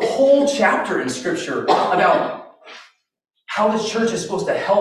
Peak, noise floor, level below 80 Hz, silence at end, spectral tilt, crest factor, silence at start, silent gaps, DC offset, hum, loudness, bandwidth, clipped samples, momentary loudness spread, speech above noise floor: -4 dBFS; -48 dBFS; -62 dBFS; 0 s; -4 dB/octave; 16 dB; 0 s; none; under 0.1%; none; -18 LUFS; 12.5 kHz; under 0.1%; 10 LU; 30 dB